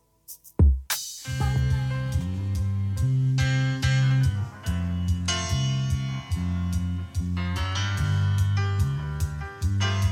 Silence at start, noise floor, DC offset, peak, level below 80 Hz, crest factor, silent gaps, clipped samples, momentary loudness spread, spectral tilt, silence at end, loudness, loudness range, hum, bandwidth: 0.3 s; -48 dBFS; under 0.1%; -8 dBFS; -32 dBFS; 16 dB; none; under 0.1%; 8 LU; -5 dB/octave; 0 s; -26 LUFS; 3 LU; none; 18.5 kHz